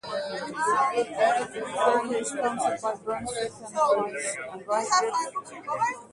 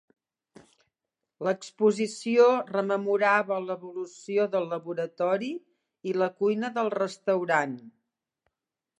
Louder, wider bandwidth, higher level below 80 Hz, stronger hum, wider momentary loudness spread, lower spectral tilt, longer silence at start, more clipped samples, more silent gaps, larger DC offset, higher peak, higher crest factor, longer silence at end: about the same, -27 LUFS vs -27 LUFS; about the same, 11.5 kHz vs 10.5 kHz; first, -66 dBFS vs -84 dBFS; neither; second, 8 LU vs 13 LU; second, -2.5 dB/octave vs -5.5 dB/octave; second, 0.05 s vs 1.4 s; neither; neither; neither; about the same, -10 dBFS vs -8 dBFS; about the same, 18 dB vs 20 dB; second, 0.05 s vs 1.1 s